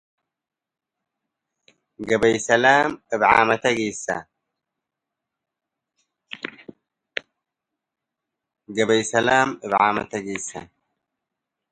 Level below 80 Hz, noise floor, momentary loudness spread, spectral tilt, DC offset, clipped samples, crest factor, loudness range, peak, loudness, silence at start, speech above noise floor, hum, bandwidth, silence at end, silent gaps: -60 dBFS; -86 dBFS; 18 LU; -3.5 dB/octave; under 0.1%; under 0.1%; 24 dB; 19 LU; 0 dBFS; -20 LUFS; 2 s; 66 dB; none; 11 kHz; 1.05 s; none